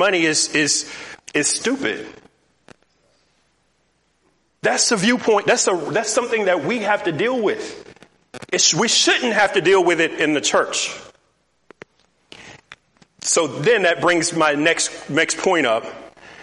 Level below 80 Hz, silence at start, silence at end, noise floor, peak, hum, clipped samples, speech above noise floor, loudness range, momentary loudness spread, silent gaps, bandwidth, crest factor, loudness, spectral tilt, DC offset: -64 dBFS; 0 s; 0 s; -65 dBFS; -2 dBFS; none; under 0.1%; 47 dB; 8 LU; 11 LU; none; 11.5 kHz; 18 dB; -18 LUFS; -2 dB/octave; under 0.1%